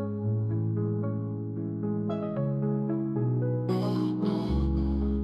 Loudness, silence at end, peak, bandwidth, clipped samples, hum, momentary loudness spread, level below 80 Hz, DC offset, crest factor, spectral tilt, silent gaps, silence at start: -29 LUFS; 0 s; -16 dBFS; 5.6 kHz; under 0.1%; none; 4 LU; -38 dBFS; under 0.1%; 12 dB; -10 dB/octave; none; 0 s